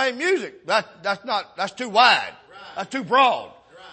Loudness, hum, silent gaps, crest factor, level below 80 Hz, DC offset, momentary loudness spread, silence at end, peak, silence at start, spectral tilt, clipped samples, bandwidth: -21 LUFS; none; none; 20 dB; -72 dBFS; under 0.1%; 14 LU; 0 s; -2 dBFS; 0 s; -2.5 dB/octave; under 0.1%; 8.8 kHz